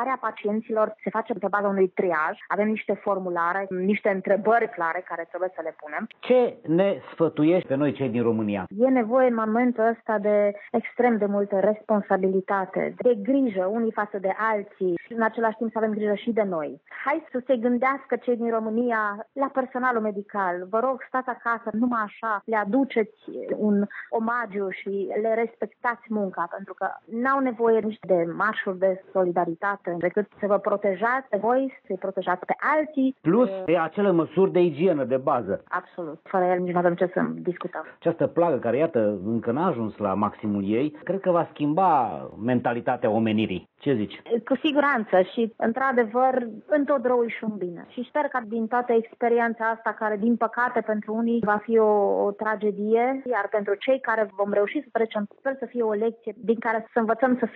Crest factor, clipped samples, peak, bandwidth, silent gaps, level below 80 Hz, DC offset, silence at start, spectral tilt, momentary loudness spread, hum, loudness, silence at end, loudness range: 16 dB; under 0.1%; -8 dBFS; 4.6 kHz; none; -74 dBFS; under 0.1%; 0 s; -9.5 dB/octave; 7 LU; none; -25 LUFS; 0 s; 3 LU